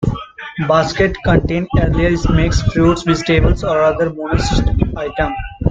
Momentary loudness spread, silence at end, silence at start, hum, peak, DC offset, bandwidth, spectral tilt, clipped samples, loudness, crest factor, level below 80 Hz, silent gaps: 7 LU; 0 s; 0 s; none; 0 dBFS; under 0.1%; 9 kHz; -6.5 dB/octave; under 0.1%; -15 LUFS; 14 dB; -22 dBFS; none